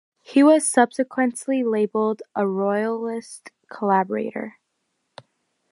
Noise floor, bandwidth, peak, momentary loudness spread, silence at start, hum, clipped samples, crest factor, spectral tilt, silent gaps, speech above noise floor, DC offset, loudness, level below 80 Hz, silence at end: -75 dBFS; 11.5 kHz; -4 dBFS; 17 LU; 0.3 s; none; under 0.1%; 20 dB; -5 dB/octave; none; 54 dB; under 0.1%; -21 LUFS; -76 dBFS; 1.2 s